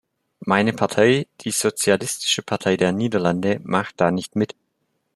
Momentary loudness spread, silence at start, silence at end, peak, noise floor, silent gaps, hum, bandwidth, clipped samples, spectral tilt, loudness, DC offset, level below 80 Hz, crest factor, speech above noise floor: 6 LU; 0.4 s; 0.7 s; -2 dBFS; -72 dBFS; none; none; 13.5 kHz; under 0.1%; -4 dB/octave; -21 LUFS; under 0.1%; -62 dBFS; 20 dB; 52 dB